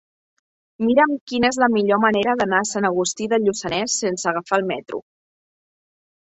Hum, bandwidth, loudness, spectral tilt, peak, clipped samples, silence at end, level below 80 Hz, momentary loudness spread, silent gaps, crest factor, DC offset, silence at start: none; 8.4 kHz; -20 LUFS; -3.5 dB/octave; -4 dBFS; under 0.1%; 1.35 s; -58 dBFS; 7 LU; 1.21-1.27 s; 18 dB; under 0.1%; 0.8 s